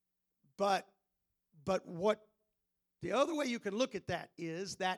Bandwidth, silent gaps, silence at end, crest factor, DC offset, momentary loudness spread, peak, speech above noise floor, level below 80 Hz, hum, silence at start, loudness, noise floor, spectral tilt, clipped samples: 19 kHz; none; 0 s; 20 dB; under 0.1%; 8 LU; -18 dBFS; 50 dB; -74 dBFS; none; 0.6 s; -37 LUFS; -86 dBFS; -4.5 dB/octave; under 0.1%